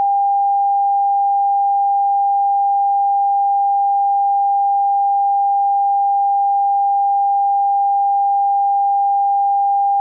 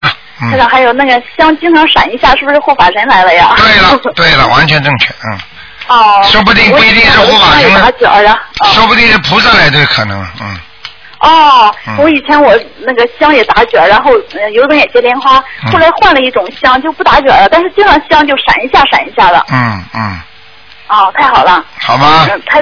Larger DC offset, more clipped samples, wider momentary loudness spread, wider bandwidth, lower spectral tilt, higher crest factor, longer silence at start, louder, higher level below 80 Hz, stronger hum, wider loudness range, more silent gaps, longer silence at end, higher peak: neither; second, under 0.1% vs 6%; second, 0 LU vs 9 LU; second, 1 kHz vs 5.4 kHz; second, 24.5 dB/octave vs -5 dB/octave; about the same, 4 dB vs 6 dB; about the same, 0 s vs 0 s; second, -15 LUFS vs -5 LUFS; second, under -90 dBFS vs -30 dBFS; neither; second, 0 LU vs 4 LU; neither; about the same, 0 s vs 0 s; second, -12 dBFS vs 0 dBFS